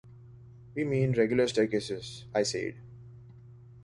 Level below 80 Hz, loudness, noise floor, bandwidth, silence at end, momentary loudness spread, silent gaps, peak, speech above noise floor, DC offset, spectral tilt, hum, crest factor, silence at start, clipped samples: -60 dBFS; -30 LUFS; -51 dBFS; 11.5 kHz; 0 s; 24 LU; none; -12 dBFS; 23 dB; under 0.1%; -5.5 dB/octave; none; 20 dB; 0.05 s; under 0.1%